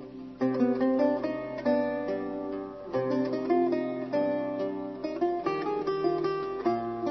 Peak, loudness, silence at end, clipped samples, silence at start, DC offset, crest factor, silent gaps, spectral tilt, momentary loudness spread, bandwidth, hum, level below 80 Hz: -14 dBFS; -30 LUFS; 0 s; under 0.1%; 0 s; under 0.1%; 16 dB; none; -8 dB/octave; 8 LU; 6.2 kHz; none; -62 dBFS